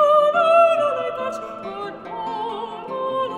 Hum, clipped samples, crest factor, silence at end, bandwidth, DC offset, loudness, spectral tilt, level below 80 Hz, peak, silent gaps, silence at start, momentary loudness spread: none; under 0.1%; 16 dB; 0 s; 11 kHz; under 0.1%; -20 LUFS; -4.5 dB/octave; -64 dBFS; -4 dBFS; none; 0 s; 16 LU